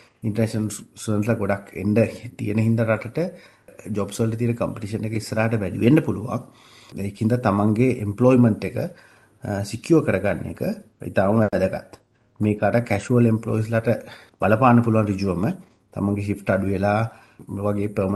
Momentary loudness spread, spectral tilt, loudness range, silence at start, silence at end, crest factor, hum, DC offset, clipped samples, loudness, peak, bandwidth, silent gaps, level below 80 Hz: 12 LU; -7.5 dB/octave; 3 LU; 0.25 s; 0 s; 20 dB; none; under 0.1%; under 0.1%; -22 LUFS; -2 dBFS; 12.5 kHz; none; -54 dBFS